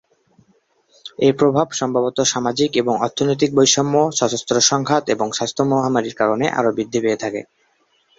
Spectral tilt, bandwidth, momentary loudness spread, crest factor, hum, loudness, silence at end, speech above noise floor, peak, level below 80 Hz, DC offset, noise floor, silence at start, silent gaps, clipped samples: -3.5 dB/octave; 8 kHz; 6 LU; 18 dB; none; -18 LUFS; 0.75 s; 44 dB; 0 dBFS; -58 dBFS; under 0.1%; -62 dBFS; 1.05 s; none; under 0.1%